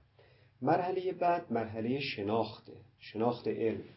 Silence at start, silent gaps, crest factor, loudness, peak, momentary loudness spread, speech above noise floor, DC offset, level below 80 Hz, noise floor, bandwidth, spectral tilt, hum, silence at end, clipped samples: 0.6 s; none; 18 dB; -34 LUFS; -16 dBFS; 9 LU; 30 dB; under 0.1%; -68 dBFS; -63 dBFS; 5.8 kHz; -5 dB/octave; none; 0.05 s; under 0.1%